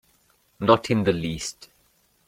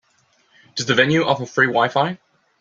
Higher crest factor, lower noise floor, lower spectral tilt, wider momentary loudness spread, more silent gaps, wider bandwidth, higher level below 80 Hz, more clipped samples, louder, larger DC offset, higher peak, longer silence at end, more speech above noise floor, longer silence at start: first, 24 dB vs 18 dB; about the same, -64 dBFS vs -61 dBFS; about the same, -5.5 dB/octave vs -4.5 dB/octave; about the same, 12 LU vs 12 LU; neither; first, 16 kHz vs 7.8 kHz; first, -52 dBFS vs -60 dBFS; neither; second, -23 LUFS vs -18 LUFS; neither; about the same, -2 dBFS vs -2 dBFS; first, 0.75 s vs 0.45 s; about the same, 42 dB vs 43 dB; second, 0.6 s vs 0.75 s